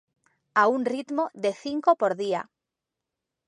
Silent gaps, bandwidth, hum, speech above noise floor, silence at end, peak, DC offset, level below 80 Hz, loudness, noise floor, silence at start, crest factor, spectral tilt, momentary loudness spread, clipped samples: none; 10.5 kHz; none; 62 dB; 1.05 s; -6 dBFS; under 0.1%; -78 dBFS; -25 LUFS; -86 dBFS; 0.55 s; 20 dB; -5 dB/octave; 7 LU; under 0.1%